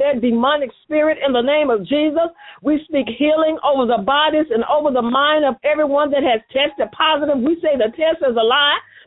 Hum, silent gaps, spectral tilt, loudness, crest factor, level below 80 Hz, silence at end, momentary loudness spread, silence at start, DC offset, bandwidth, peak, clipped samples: none; none; -9.5 dB/octave; -17 LUFS; 14 dB; -54 dBFS; 0.25 s; 4 LU; 0 s; under 0.1%; 4.1 kHz; -2 dBFS; under 0.1%